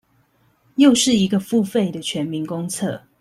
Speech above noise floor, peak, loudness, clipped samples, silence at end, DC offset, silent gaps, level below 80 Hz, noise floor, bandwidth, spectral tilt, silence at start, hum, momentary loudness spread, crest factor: 42 dB; -2 dBFS; -19 LUFS; under 0.1%; 0.2 s; under 0.1%; none; -58 dBFS; -60 dBFS; 15 kHz; -4.5 dB/octave; 0.8 s; none; 12 LU; 18 dB